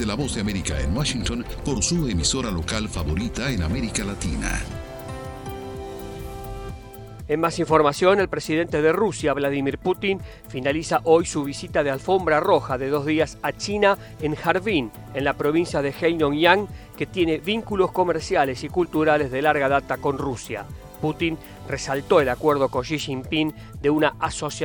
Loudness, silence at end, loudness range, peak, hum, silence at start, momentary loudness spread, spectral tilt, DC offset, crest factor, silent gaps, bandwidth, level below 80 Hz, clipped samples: -23 LUFS; 0 s; 6 LU; 0 dBFS; none; 0 s; 15 LU; -4.5 dB/octave; under 0.1%; 22 dB; none; over 20 kHz; -38 dBFS; under 0.1%